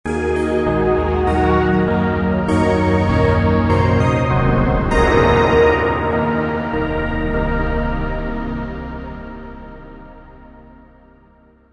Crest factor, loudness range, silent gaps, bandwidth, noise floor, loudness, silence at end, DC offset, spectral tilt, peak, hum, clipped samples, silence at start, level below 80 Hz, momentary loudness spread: 16 dB; 13 LU; none; 11 kHz; -50 dBFS; -17 LUFS; 1.4 s; under 0.1%; -8 dB/octave; 0 dBFS; none; under 0.1%; 0.05 s; -28 dBFS; 15 LU